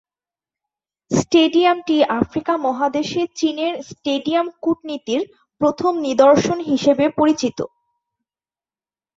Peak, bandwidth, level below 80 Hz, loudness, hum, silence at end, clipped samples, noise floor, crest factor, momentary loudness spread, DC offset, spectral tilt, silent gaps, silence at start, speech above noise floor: -2 dBFS; 7.8 kHz; -54 dBFS; -18 LUFS; none; 1.5 s; under 0.1%; under -90 dBFS; 18 dB; 10 LU; under 0.1%; -5 dB/octave; none; 1.1 s; over 72 dB